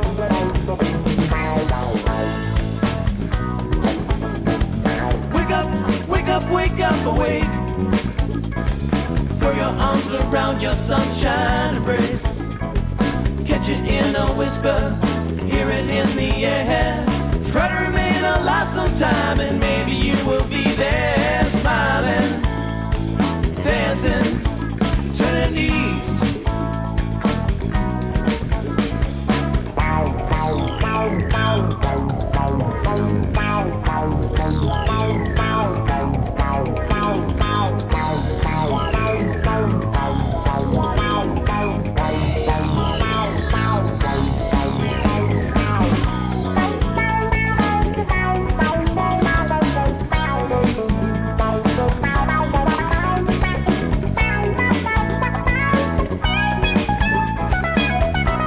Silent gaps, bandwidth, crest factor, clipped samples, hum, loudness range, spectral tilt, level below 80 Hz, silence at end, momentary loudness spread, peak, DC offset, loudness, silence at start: none; 4 kHz; 12 dB; under 0.1%; none; 2 LU; -11 dB/octave; -26 dBFS; 0 s; 4 LU; -6 dBFS; under 0.1%; -20 LUFS; 0 s